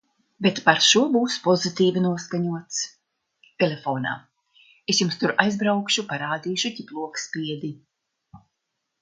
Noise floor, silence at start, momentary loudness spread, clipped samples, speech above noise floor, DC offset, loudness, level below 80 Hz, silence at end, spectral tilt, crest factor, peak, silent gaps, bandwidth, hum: -79 dBFS; 0.4 s; 13 LU; under 0.1%; 56 dB; under 0.1%; -23 LUFS; -70 dBFS; 0.65 s; -3.5 dB/octave; 24 dB; 0 dBFS; none; 9.6 kHz; none